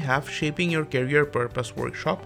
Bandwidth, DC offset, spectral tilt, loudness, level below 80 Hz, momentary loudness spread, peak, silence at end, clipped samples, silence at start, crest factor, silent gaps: 15.5 kHz; under 0.1%; -5.5 dB/octave; -25 LUFS; -52 dBFS; 7 LU; -8 dBFS; 0 s; under 0.1%; 0 s; 18 dB; none